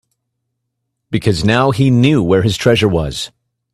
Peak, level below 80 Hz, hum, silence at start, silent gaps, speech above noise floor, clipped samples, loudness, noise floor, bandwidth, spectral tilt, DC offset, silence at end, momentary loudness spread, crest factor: 0 dBFS; -38 dBFS; none; 1.1 s; none; 61 dB; under 0.1%; -13 LUFS; -73 dBFS; 13 kHz; -6 dB/octave; under 0.1%; 0.45 s; 11 LU; 14 dB